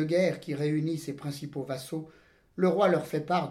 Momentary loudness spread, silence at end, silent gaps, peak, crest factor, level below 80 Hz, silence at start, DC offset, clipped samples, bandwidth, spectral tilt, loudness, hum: 13 LU; 0 s; none; -12 dBFS; 18 dB; -68 dBFS; 0 s; under 0.1%; under 0.1%; 15.5 kHz; -6.5 dB/octave; -30 LUFS; none